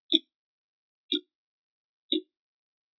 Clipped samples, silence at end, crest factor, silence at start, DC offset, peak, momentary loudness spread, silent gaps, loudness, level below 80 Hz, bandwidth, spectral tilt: under 0.1%; 0.8 s; 30 dB; 0.1 s; under 0.1%; -6 dBFS; 5 LU; 0.34-1.09 s, 1.35-2.09 s; -30 LUFS; under -90 dBFS; 5.4 kHz; 1.5 dB/octave